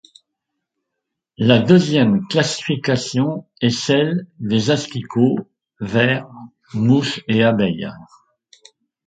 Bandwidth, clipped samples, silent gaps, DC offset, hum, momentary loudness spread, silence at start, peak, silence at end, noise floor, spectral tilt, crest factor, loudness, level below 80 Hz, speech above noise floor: 9.4 kHz; under 0.1%; none; under 0.1%; none; 10 LU; 1.4 s; 0 dBFS; 1.05 s; -80 dBFS; -6 dB/octave; 18 dB; -18 LUFS; -54 dBFS; 63 dB